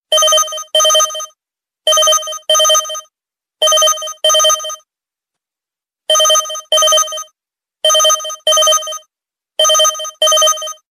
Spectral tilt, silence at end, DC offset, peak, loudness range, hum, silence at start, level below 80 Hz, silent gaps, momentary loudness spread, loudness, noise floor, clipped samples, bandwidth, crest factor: 4.5 dB/octave; 0.2 s; under 0.1%; 0 dBFS; 3 LU; none; 0.1 s; -64 dBFS; none; 16 LU; -11 LUFS; -88 dBFS; under 0.1%; 14.5 kHz; 14 dB